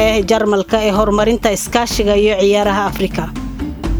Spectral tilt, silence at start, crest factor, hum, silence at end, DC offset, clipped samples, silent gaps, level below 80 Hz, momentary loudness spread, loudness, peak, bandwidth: -4.5 dB/octave; 0 s; 14 dB; none; 0 s; under 0.1%; under 0.1%; none; -28 dBFS; 10 LU; -15 LUFS; 0 dBFS; over 20 kHz